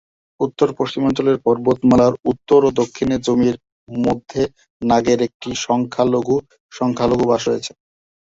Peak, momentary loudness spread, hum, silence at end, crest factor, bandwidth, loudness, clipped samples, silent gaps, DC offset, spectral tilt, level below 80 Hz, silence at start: -2 dBFS; 10 LU; none; 0.7 s; 16 dB; 7.8 kHz; -18 LUFS; under 0.1%; 3.72-3.87 s, 4.70-4.80 s, 5.34-5.40 s, 6.60-6.69 s; under 0.1%; -6 dB/octave; -48 dBFS; 0.4 s